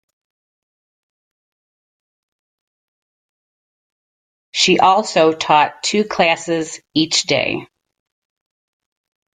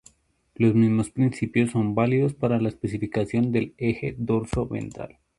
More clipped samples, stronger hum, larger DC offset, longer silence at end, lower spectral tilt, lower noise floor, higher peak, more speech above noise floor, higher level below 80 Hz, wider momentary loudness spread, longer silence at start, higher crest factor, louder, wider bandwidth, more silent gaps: neither; neither; neither; first, 1.7 s vs 0.3 s; second, -3 dB/octave vs -8 dB/octave; first, under -90 dBFS vs -58 dBFS; first, -2 dBFS vs -8 dBFS; first, over 74 dB vs 34 dB; second, -60 dBFS vs -48 dBFS; about the same, 9 LU vs 8 LU; first, 4.55 s vs 0.6 s; about the same, 20 dB vs 16 dB; first, -15 LUFS vs -24 LUFS; second, 9.6 kHz vs 11.5 kHz; neither